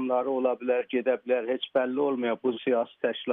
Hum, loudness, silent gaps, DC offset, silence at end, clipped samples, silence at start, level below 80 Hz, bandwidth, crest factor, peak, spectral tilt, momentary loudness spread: none; -28 LUFS; none; under 0.1%; 0 s; under 0.1%; 0 s; -86 dBFS; 3.9 kHz; 14 dB; -12 dBFS; -2.5 dB/octave; 2 LU